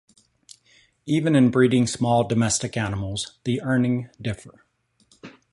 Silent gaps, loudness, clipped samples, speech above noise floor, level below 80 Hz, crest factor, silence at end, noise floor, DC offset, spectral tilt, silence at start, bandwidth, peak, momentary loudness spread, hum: none; -22 LUFS; under 0.1%; 44 dB; -52 dBFS; 18 dB; 0.25 s; -66 dBFS; under 0.1%; -5.5 dB/octave; 1.05 s; 11.5 kHz; -6 dBFS; 13 LU; none